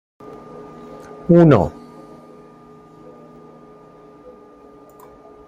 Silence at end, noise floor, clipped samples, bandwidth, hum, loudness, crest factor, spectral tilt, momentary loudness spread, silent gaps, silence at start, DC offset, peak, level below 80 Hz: 3.8 s; -45 dBFS; under 0.1%; 7.2 kHz; none; -14 LUFS; 20 dB; -10 dB/octave; 30 LU; none; 1.3 s; under 0.1%; -2 dBFS; -50 dBFS